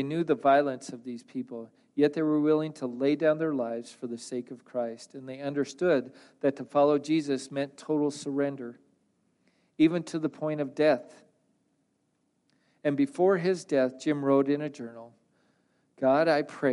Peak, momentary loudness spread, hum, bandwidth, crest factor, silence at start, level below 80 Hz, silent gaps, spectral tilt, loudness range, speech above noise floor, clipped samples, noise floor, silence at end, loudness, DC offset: -12 dBFS; 14 LU; none; 11.5 kHz; 16 dB; 0 s; -80 dBFS; none; -6.5 dB/octave; 3 LU; 47 dB; under 0.1%; -74 dBFS; 0 s; -28 LUFS; under 0.1%